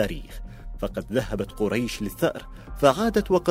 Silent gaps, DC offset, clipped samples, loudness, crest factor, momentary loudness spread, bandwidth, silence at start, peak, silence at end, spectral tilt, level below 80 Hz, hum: none; under 0.1%; under 0.1%; -25 LUFS; 22 dB; 20 LU; 16 kHz; 0 s; -4 dBFS; 0 s; -5.5 dB/octave; -40 dBFS; none